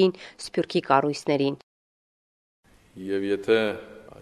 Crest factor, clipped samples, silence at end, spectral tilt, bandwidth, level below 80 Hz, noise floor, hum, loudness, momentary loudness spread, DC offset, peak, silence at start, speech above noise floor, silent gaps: 22 dB; under 0.1%; 0 s; -5.5 dB/octave; 12.5 kHz; -64 dBFS; under -90 dBFS; none; -25 LUFS; 16 LU; under 0.1%; -4 dBFS; 0 s; over 66 dB; 1.63-2.63 s